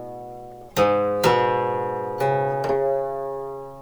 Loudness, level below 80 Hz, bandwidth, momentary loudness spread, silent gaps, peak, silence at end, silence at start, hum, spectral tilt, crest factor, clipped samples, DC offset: -23 LUFS; -52 dBFS; over 20 kHz; 16 LU; none; -6 dBFS; 0 s; 0 s; none; -5.5 dB/octave; 18 dB; under 0.1%; under 0.1%